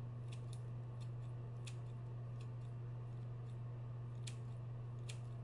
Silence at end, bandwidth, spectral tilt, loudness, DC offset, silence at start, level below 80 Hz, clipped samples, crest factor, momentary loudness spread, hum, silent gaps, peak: 0 s; 11 kHz; -6.5 dB/octave; -49 LUFS; under 0.1%; 0 s; -66 dBFS; under 0.1%; 14 dB; 1 LU; none; none; -32 dBFS